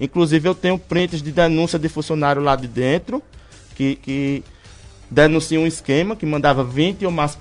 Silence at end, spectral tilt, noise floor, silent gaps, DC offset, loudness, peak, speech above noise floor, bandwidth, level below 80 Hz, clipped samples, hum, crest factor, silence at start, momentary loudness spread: 0 s; -6 dB/octave; -42 dBFS; none; under 0.1%; -19 LUFS; 0 dBFS; 24 dB; 11 kHz; -42 dBFS; under 0.1%; none; 18 dB; 0 s; 7 LU